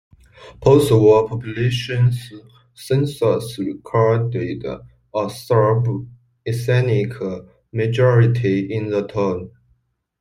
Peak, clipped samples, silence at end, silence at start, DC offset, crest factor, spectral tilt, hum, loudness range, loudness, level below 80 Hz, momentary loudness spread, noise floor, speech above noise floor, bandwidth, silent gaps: -2 dBFS; under 0.1%; 0.7 s; 0.4 s; under 0.1%; 16 dB; -7.5 dB/octave; none; 3 LU; -19 LUFS; -50 dBFS; 15 LU; -64 dBFS; 46 dB; 15 kHz; none